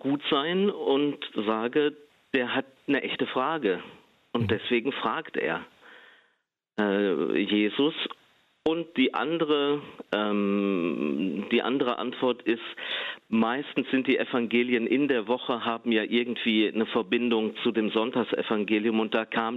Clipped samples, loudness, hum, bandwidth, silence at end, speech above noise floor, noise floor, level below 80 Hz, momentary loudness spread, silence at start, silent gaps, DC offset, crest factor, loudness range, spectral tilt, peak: under 0.1%; -27 LUFS; none; 5.6 kHz; 0 s; 48 dB; -75 dBFS; -72 dBFS; 6 LU; 0.05 s; none; under 0.1%; 18 dB; 3 LU; -7.5 dB/octave; -10 dBFS